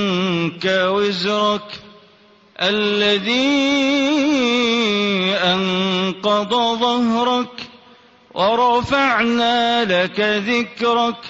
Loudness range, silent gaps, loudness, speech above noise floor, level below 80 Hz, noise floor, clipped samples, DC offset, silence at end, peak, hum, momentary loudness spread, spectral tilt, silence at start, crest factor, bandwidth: 3 LU; none; -17 LUFS; 33 dB; -54 dBFS; -50 dBFS; under 0.1%; under 0.1%; 0 s; -2 dBFS; none; 4 LU; -4.5 dB/octave; 0 s; 16 dB; 8 kHz